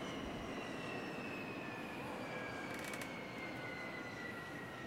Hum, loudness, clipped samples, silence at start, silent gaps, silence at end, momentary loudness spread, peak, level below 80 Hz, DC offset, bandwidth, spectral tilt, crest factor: none; -45 LUFS; under 0.1%; 0 s; none; 0 s; 2 LU; -30 dBFS; -66 dBFS; under 0.1%; 16 kHz; -4.5 dB/octave; 16 dB